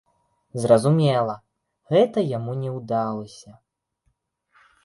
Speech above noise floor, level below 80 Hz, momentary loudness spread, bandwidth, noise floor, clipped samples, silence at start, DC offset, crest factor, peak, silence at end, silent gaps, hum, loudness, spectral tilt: 50 dB; -64 dBFS; 16 LU; 11.5 kHz; -72 dBFS; under 0.1%; 0.55 s; under 0.1%; 20 dB; -2 dBFS; 1.35 s; none; none; -22 LUFS; -7 dB/octave